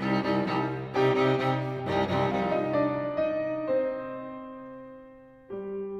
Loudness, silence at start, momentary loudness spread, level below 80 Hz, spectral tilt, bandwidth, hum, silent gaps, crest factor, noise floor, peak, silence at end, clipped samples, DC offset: -28 LUFS; 0 s; 17 LU; -60 dBFS; -7.5 dB/octave; 8.4 kHz; none; none; 16 dB; -50 dBFS; -12 dBFS; 0 s; under 0.1%; under 0.1%